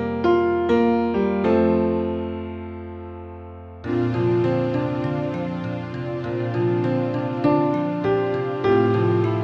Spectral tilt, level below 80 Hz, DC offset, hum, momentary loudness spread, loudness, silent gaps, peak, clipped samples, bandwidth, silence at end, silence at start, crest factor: -9.5 dB/octave; -48 dBFS; under 0.1%; none; 15 LU; -22 LUFS; none; -6 dBFS; under 0.1%; 6.4 kHz; 0 s; 0 s; 14 dB